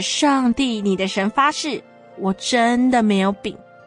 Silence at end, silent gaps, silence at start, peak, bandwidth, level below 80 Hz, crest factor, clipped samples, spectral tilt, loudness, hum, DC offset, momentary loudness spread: 0.3 s; none; 0 s; -4 dBFS; 10 kHz; -52 dBFS; 16 dB; under 0.1%; -4 dB/octave; -19 LUFS; none; under 0.1%; 10 LU